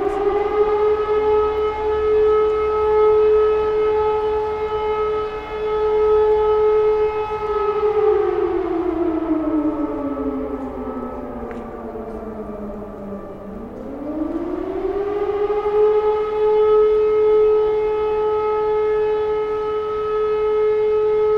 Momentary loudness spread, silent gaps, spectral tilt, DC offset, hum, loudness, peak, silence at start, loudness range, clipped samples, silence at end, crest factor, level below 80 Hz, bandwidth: 15 LU; none; -7.5 dB/octave; under 0.1%; none; -19 LUFS; -6 dBFS; 0 s; 11 LU; under 0.1%; 0 s; 12 dB; -40 dBFS; 5.4 kHz